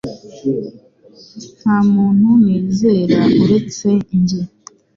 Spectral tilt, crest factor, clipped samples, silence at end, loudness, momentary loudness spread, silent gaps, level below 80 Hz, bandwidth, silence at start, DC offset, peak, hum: -7.5 dB/octave; 14 dB; under 0.1%; 0.5 s; -14 LUFS; 17 LU; none; -50 dBFS; 7.4 kHz; 0.05 s; under 0.1%; 0 dBFS; none